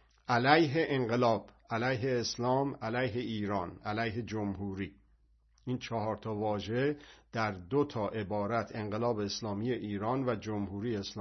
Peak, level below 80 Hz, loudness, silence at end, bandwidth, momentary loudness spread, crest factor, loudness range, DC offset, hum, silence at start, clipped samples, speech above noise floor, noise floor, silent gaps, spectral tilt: -8 dBFS; -64 dBFS; -33 LUFS; 0 s; 6.2 kHz; 8 LU; 24 dB; 6 LU; under 0.1%; none; 0.3 s; under 0.1%; 34 dB; -67 dBFS; none; -4.5 dB/octave